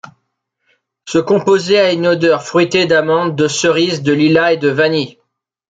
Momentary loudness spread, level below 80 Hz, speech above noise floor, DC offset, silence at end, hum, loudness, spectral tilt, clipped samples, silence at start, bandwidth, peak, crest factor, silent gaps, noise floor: 4 LU; -56 dBFS; 57 dB; under 0.1%; 0.6 s; none; -13 LUFS; -5 dB/octave; under 0.1%; 1.05 s; 9.4 kHz; 0 dBFS; 14 dB; none; -70 dBFS